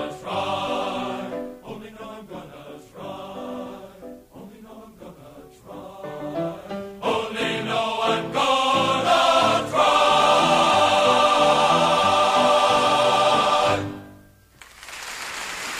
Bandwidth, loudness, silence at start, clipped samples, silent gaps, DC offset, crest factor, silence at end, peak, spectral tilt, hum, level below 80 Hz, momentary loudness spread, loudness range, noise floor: 15.5 kHz; -20 LUFS; 0 s; under 0.1%; none; under 0.1%; 16 dB; 0 s; -8 dBFS; -3 dB/octave; none; -56 dBFS; 22 LU; 21 LU; -50 dBFS